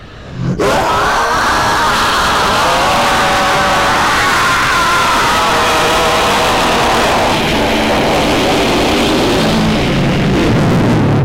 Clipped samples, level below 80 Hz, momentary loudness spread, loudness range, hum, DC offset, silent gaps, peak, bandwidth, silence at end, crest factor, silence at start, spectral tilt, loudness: under 0.1%; -28 dBFS; 2 LU; 1 LU; none; under 0.1%; none; -2 dBFS; 16 kHz; 0 s; 8 dB; 0 s; -4 dB/octave; -11 LUFS